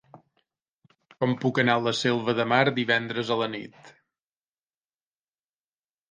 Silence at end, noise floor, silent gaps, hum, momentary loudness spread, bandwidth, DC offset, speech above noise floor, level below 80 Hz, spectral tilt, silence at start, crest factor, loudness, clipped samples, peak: 2.2 s; under -90 dBFS; 0.62-0.66 s, 0.75-0.82 s; none; 8 LU; 9.6 kHz; under 0.1%; over 65 dB; -72 dBFS; -5.5 dB/octave; 0.15 s; 24 dB; -25 LUFS; under 0.1%; -6 dBFS